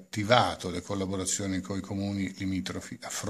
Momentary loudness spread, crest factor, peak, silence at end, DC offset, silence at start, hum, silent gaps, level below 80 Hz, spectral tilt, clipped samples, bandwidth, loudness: 12 LU; 26 dB; -4 dBFS; 0 s; under 0.1%; 0 s; none; none; -64 dBFS; -4 dB/octave; under 0.1%; 15 kHz; -30 LUFS